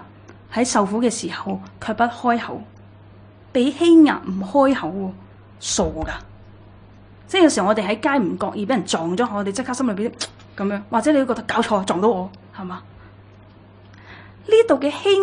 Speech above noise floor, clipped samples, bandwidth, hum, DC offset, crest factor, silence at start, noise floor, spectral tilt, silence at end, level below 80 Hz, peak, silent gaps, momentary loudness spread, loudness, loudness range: 27 dB; under 0.1%; 10.5 kHz; none; under 0.1%; 20 dB; 0 s; -46 dBFS; -4.5 dB/octave; 0 s; -48 dBFS; -2 dBFS; none; 15 LU; -20 LUFS; 4 LU